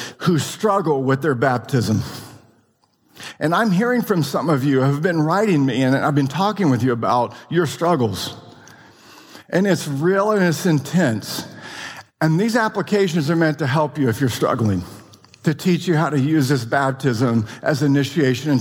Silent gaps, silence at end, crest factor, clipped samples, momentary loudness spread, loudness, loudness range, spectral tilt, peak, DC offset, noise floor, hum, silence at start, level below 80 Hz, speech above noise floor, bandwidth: none; 0 s; 14 dB; under 0.1%; 8 LU; -19 LUFS; 3 LU; -6 dB/octave; -4 dBFS; under 0.1%; -61 dBFS; none; 0 s; -58 dBFS; 43 dB; 18.5 kHz